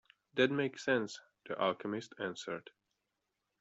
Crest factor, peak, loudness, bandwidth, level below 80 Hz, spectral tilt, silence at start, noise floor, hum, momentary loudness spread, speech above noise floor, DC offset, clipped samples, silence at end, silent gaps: 22 dB; -16 dBFS; -36 LUFS; 8 kHz; -82 dBFS; -5 dB/octave; 0.35 s; -86 dBFS; none; 13 LU; 50 dB; under 0.1%; under 0.1%; 1 s; none